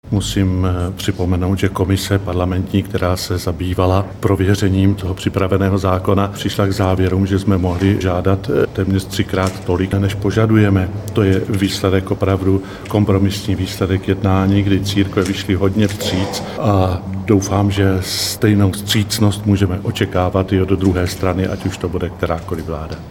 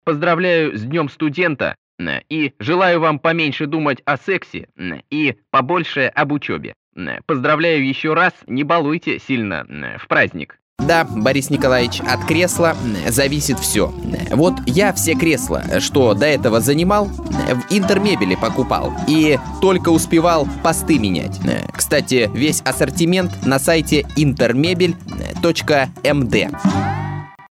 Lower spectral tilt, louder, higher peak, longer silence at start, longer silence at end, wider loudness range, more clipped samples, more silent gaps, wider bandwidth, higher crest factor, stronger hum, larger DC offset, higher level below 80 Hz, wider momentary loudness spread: first, -6 dB/octave vs -4.5 dB/octave; about the same, -17 LUFS vs -17 LUFS; about the same, 0 dBFS vs 0 dBFS; about the same, 0.05 s vs 0.05 s; second, 0 s vs 0.15 s; about the same, 2 LU vs 3 LU; neither; second, none vs 1.78-1.98 s, 6.76-6.92 s, 10.62-10.76 s; about the same, 16.5 kHz vs 16.5 kHz; about the same, 16 dB vs 16 dB; neither; neither; about the same, -36 dBFS vs -38 dBFS; about the same, 6 LU vs 8 LU